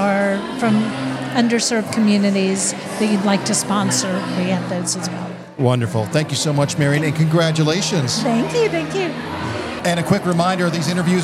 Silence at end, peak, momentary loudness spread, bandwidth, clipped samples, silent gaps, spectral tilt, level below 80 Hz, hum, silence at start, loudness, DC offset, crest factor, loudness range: 0 s; -2 dBFS; 6 LU; 15.5 kHz; under 0.1%; none; -5 dB/octave; -56 dBFS; none; 0 s; -18 LUFS; under 0.1%; 16 dB; 2 LU